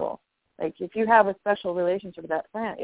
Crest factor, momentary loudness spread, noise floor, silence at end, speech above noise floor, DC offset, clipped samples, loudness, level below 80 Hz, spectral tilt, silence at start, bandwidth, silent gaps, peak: 22 dB; 14 LU; -44 dBFS; 0 s; 20 dB; under 0.1%; under 0.1%; -25 LUFS; -66 dBFS; -9 dB/octave; 0 s; 4 kHz; none; -4 dBFS